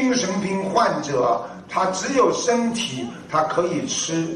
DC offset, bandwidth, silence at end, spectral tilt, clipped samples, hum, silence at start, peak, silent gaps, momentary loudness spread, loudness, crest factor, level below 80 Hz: under 0.1%; 11.5 kHz; 0 s; -4 dB/octave; under 0.1%; none; 0 s; -6 dBFS; none; 6 LU; -22 LUFS; 16 dB; -58 dBFS